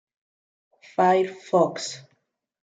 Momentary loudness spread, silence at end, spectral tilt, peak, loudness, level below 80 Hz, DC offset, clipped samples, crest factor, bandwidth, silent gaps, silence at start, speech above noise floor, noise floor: 13 LU; 0.8 s; -5 dB/octave; -8 dBFS; -23 LUFS; -78 dBFS; under 0.1%; under 0.1%; 18 dB; 9.2 kHz; none; 1 s; 49 dB; -71 dBFS